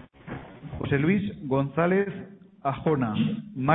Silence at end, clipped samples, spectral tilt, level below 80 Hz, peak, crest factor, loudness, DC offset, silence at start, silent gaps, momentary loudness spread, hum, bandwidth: 0 s; under 0.1%; -11.5 dB/octave; -54 dBFS; -6 dBFS; 20 dB; -27 LUFS; under 0.1%; 0 s; none; 17 LU; none; 4 kHz